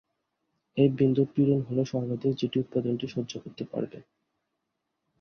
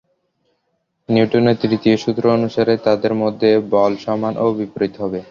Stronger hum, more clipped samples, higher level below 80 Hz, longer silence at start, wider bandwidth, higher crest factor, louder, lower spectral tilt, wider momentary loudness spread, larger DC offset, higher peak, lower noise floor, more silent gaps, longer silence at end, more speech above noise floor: neither; neither; second, -66 dBFS vs -56 dBFS; second, 0.75 s vs 1.1 s; about the same, 6.6 kHz vs 7.2 kHz; about the same, 20 dB vs 16 dB; second, -28 LUFS vs -17 LUFS; about the same, -8 dB/octave vs -7.5 dB/octave; first, 12 LU vs 6 LU; neither; second, -10 dBFS vs -2 dBFS; first, -82 dBFS vs -70 dBFS; neither; first, 1.2 s vs 0.05 s; about the same, 55 dB vs 53 dB